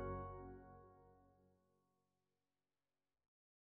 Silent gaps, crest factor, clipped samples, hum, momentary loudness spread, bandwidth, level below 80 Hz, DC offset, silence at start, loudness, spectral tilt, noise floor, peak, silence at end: none; 20 dB; under 0.1%; none; 18 LU; 3.8 kHz; -68 dBFS; under 0.1%; 0 s; -54 LUFS; -5.5 dB/octave; under -90 dBFS; -36 dBFS; 2.25 s